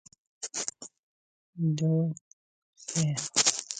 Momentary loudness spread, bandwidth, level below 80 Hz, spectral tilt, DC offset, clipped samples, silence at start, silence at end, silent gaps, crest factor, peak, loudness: 20 LU; 9.6 kHz; -72 dBFS; -3.5 dB/octave; under 0.1%; under 0.1%; 0.4 s; 0 s; 0.99-1.53 s, 2.21-2.73 s; 26 dB; -4 dBFS; -29 LUFS